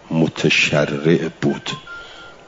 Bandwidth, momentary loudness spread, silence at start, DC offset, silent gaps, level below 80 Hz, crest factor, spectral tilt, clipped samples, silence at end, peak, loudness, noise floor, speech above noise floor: 7.8 kHz; 20 LU; 0.05 s; under 0.1%; none; -54 dBFS; 16 dB; -5 dB/octave; under 0.1%; 0.15 s; -2 dBFS; -18 LUFS; -38 dBFS; 20 dB